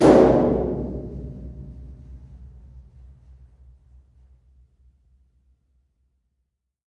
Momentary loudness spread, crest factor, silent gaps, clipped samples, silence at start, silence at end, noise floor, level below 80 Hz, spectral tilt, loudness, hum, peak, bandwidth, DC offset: 30 LU; 24 dB; none; under 0.1%; 0 s; 4.4 s; -77 dBFS; -40 dBFS; -8 dB/octave; -20 LUFS; none; -2 dBFS; 11.5 kHz; under 0.1%